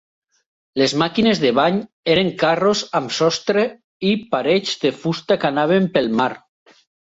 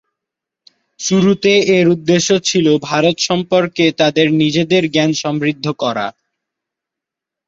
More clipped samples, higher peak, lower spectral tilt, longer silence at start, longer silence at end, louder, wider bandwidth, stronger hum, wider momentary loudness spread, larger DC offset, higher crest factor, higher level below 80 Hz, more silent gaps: neither; about the same, -2 dBFS vs 0 dBFS; about the same, -5 dB/octave vs -4.5 dB/octave; second, 0.75 s vs 1 s; second, 0.65 s vs 1.4 s; second, -18 LUFS vs -14 LUFS; about the same, 8 kHz vs 7.8 kHz; neither; about the same, 7 LU vs 7 LU; neither; about the same, 16 dB vs 14 dB; about the same, -58 dBFS vs -56 dBFS; first, 1.93-2.03 s, 3.84-4.00 s vs none